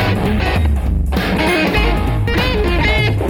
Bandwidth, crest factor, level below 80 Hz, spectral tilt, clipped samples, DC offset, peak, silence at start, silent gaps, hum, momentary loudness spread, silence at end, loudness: 19 kHz; 12 dB; -18 dBFS; -6.5 dB/octave; under 0.1%; under 0.1%; -2 dBFS; 0 s; none; none; 3 LU; 0 s; -16 LUFS